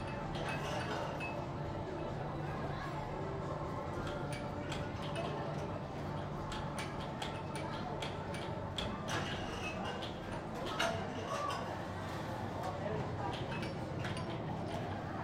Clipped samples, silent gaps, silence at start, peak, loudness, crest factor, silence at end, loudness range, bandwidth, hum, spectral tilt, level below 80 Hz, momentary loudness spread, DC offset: under 0.1%; none; 0 s; -22 dBFS; -40 LUFS; 18 dB; 0 s; 2 LU; 16 kHz; none; -5.5 dB/octave; -56 dBFS; 3 LU; under 0.1%